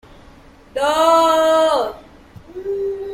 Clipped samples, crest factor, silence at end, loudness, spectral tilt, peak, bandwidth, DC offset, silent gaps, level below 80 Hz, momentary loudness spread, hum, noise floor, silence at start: under 0.1%; 16 dB; 0 s; -16 LUFS; -3 dB/octave; -2 dBFS; 16.5 kHz; under 0.1%; none; -50 dBFS; 17 LU; none; -44 dBFS; 0.75 s